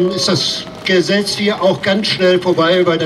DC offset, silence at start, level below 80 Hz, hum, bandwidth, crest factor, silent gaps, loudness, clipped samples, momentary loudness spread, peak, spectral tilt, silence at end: under 0.1%; 0 s; -52 dBFS; none; 13 kHz; 12 dB; none; -14 LUFS; under 0.1%; 3 LU; -2 dBFS; -4.5 dB/octave; 0 s